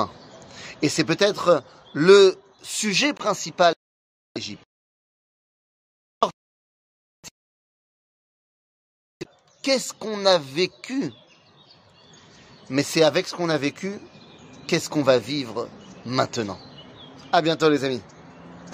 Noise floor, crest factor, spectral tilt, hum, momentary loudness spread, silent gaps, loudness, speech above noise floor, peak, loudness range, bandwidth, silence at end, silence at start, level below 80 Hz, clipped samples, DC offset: -54 dBFS; 24 dB; -4 dB/octave; none; 21 LU; 3.76-4.35 s, 4.65-6.21 s, 6.33-7.23 s, 7.31-9.20 s; -22 LUFS; 32 dB; -2 dBFS; 15 LU; 15.5 kHz; 0 s; 0 s; -68 dBFS; under 0.1%; under 0.1%